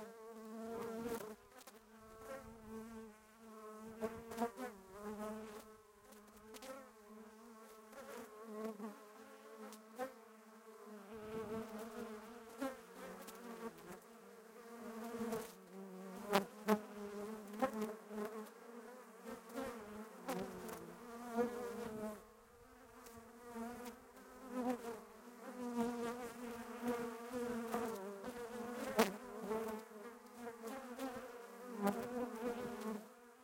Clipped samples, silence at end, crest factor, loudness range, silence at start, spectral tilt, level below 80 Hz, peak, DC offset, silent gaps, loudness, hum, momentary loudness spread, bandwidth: under 0.1%; 0 s; 32 dB; 9 LU; 0 s; -5 dB/octave; -76 dBFS; -16 dBFS; under 0.1%; none; -46 LUFS; none; 17 LU; 16.5 kHz